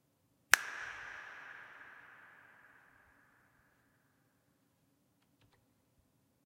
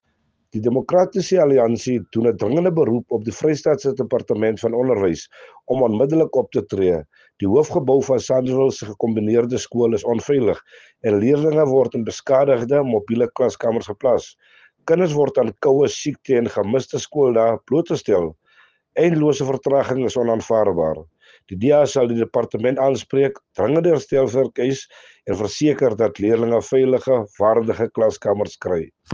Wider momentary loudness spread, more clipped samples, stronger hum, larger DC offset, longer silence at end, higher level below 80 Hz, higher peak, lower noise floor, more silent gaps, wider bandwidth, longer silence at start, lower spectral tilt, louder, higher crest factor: first, 26 LU vs 7 LU; neither; neither; neither; first, 3.8 s vs 0 s; second, -80 dBFS vs -58 dBFS; first, 0 dBFS vs -4 dBFS; first, -76 dBFS vs -68 dBFS; neither; first, 16 kHz vs 7.6 kHz; about the same, 0.5 s vs 0.55 s; second, 1.5 dB/octave vs -6.5 dB/octave; second, -34 LUFS vs -19 LUFS; first, 44 dB vs 16 dB